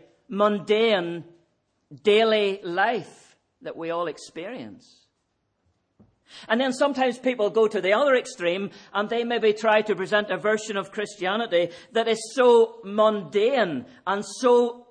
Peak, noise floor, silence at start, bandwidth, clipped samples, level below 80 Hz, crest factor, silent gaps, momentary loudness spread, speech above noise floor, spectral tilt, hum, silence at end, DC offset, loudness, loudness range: -6 dBFS; -74 dBFS; 0.3 s; 10 kHz; under 0.1%; -76 dBFS; 18 dB; none; 12 LU; 51 dB; -4 dB/octave; none; 0.1 s; under 0.1%; -23 LUFS; 8 LU